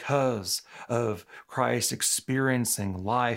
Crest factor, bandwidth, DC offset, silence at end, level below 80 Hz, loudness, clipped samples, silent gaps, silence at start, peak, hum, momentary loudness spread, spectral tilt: 18 dB; 16 kHz; under 0.1%; 0 s; -70 dBFS; -27 LUFS; under 0.1%; none; 0 s; -10 dBFS; none; 7 LU; -3.5 dB/octave